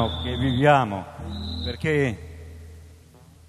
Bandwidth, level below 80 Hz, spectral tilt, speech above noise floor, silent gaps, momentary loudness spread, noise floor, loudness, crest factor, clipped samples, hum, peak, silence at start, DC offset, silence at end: 13 kHz; -38 dBFS; -6.5 dB/octave; 27 dB; none; 23 LU; -50 dBFS; -23 LUFS; 20 dB; under 0.1%; none; -4 dBFS; 0 s; under 0.1%; 0.55 s